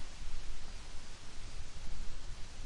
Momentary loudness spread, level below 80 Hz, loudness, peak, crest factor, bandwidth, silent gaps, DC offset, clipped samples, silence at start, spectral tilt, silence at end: 2 LU; -44 dBFS; -50 LUFS; -24 dBFS; 10 dB; 10.5 kHz; none; under 0.1%; under 0.1%; 0 s; -3.5 dB/octave; 0 s